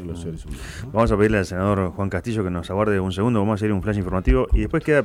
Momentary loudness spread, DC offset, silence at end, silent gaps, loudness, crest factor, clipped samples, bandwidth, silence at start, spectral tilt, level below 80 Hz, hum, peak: 13 LU; under 0.1%; 0 s; none; -22 LUFS; 14 dB; under 0.1%; 13 kHz; 0 s; -7.5 dB/octave; -30 dBFS; none; -6 dBFS